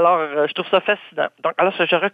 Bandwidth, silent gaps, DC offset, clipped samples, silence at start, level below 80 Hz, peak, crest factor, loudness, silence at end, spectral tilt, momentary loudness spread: 5 kHz; none; under 0.1%; under 0.1%; 0 s; -66 dBFS; -2 dBFS; 16 dB; -19 LUFS; 0.05 s; -6.5 dB/octave; 5 LU